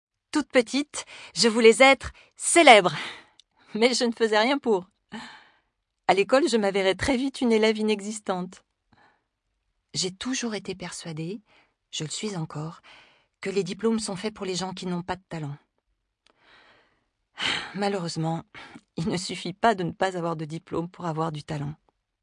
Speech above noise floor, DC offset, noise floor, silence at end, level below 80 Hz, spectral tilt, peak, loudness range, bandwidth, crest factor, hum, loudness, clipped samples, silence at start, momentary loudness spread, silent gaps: 53 dB; under 0.1%; -77 dBFS; 0.5 s; -58 dBFS; -3.5 dB/octave; 0 dBFS; 14 LU; 10.5 kHz; 26 dB; none; -24 LUFS; under 0.1%; 0.35 s; 19 LU; none